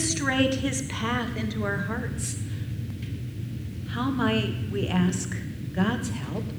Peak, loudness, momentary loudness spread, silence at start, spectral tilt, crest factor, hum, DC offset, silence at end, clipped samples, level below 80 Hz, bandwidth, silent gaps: -8 dBFS; -28 LUFS; 10 LU; 0 s; -5 dB/octave; 18 dB; none; under 0.1%; 0 s; under 0.1%; -44 dBFS; over 20 kHz; none